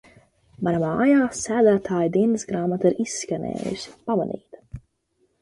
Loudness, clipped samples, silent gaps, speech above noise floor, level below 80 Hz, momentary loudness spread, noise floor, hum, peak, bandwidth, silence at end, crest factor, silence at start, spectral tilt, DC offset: -23 LUFS; under 0.1%; none; 47 dB; -56 dBFS; 16 LU; -69 dBFS; none; -6 dBFS; 11.5 kHz; 0.6 s; 16 dB; 0.6 s; -6 dB/octave; under 0.1%